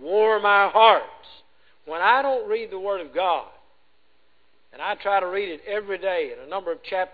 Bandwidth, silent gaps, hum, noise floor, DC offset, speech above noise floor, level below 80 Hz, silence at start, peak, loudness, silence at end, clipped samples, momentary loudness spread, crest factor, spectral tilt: 4.9 kHz; none; none; -66 dBFS; 0.2%; 44 dB; -64 dBFS; 0 s; -2 dBFS; -22 LUFS; 0.05 s; under 0.1%; 14 LU; 22 dB; -5.5 dB/octave